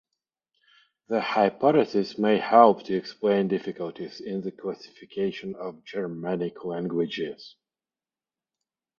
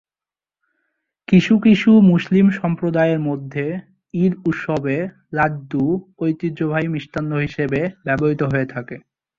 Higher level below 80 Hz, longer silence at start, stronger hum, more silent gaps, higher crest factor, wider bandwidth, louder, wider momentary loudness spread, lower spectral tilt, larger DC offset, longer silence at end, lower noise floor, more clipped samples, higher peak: second, -70 dBFS vs -52 dBFS; second, 1.1 s vs 1.3 s; neither; neither; first, 26 dB vs 16 dB; about the same, 7 kHz vs 7.2 kHz; second, -26 LUFS vs -18 LUFS; first, 16 LU vs 12 LU; second, -7 dB/octave vs -8.5 dB/octave; neither; first, 1.5 s vs 0.4 s; about the same, under -90 dBFS vs under -90 dBFS; neither; about the same, -2 dBFS vs -2 dBFS